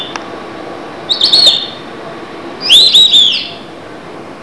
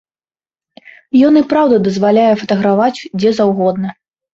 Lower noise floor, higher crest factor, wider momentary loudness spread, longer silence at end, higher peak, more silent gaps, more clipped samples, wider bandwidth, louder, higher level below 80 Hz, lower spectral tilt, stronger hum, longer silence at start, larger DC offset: second, -29 dBFS vs under -90 dBFS; about the same, 12 dB vs 12 dB; first, 24 LU vs 7 LU; second, 0 s vs 0.4 s; about the same, 0 dBFS vs 0 dBFS; neither; first, 0.9% vs under 0.1%; first, 11 kHz vs 7.8 kHz; first, -5 LUFS vs -12 LUFS; about the same, -52 dBFS vs -54 dBFS; second, -0.5 dB/octave vs -7 dB/octave; neither; second, 0 s vs 1.15 s; first, 0.8% vs under 0.1%